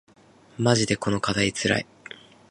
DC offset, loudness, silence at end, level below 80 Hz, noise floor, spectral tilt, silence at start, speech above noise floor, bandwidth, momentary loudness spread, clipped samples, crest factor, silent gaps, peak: under 0.1%; -24 LUFS; 0.35 s; -52 dBFS; -46 dBFS; -4.5 dB/octave; 0.6 s; 23 dB; 11.5 kHz; 21 LU; under 0.1%; 22 dB; none; -4 dBFS